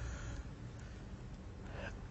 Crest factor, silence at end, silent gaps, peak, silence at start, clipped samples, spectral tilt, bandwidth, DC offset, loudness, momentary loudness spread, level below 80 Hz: 16 dB; 0 s; none; -30 dBFS; 0 s; under 0.1%; -5.5 dB/octave; 8.2 kHz; under 0.1%; -49 LUFS; 4 LU; -50 dBFS